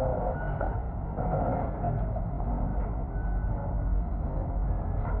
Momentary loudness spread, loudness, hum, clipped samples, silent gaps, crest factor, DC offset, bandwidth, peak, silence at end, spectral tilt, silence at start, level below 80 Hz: 3 LU; -32 LUFS; none; under 0.1%; none; 14 dB; under 0.1%; 2.4 kHz; -16 dBFS; 0 s; -11 dB/octave; 0 s; -32 dBFS